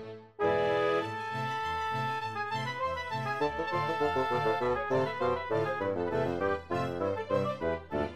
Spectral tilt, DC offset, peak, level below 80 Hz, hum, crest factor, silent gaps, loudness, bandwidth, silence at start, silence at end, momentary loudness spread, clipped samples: -6 dB/octave; 0.2%; -16 dBFS; -58 dBFS; none; 16 dB; none; -31 LUFS; 14.5 kHz; 0 s; 0 s; 5 LU; under 0.1%